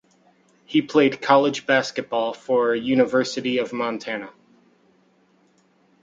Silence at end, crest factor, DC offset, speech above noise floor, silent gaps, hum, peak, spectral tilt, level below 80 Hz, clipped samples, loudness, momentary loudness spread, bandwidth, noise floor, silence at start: 1.75 s; 20 dB; under 0.1%; 40 dB; none; none; -2 dBFS; -5 dB/octave; -68 dBFS; under 0.1%; -21 LUFS; 9 LU; 7.8 kHz; -61 dBFS; 0.7 s